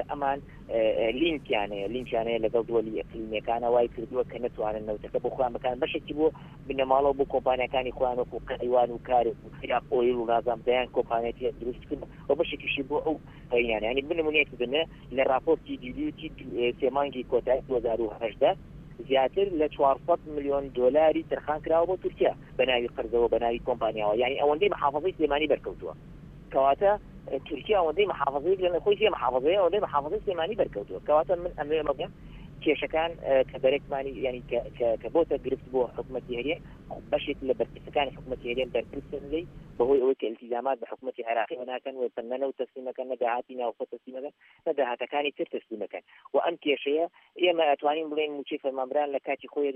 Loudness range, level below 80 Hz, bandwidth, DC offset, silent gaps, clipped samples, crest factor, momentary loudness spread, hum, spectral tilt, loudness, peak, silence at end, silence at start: 5 LU; -52 dBFS; 4 kHz; under 0.1%; none; under 0.1%; 20 dB; 11 LU; none; -7.5 dB/octave; -28 LUFS; -8 dBFS; 0 s; 0 s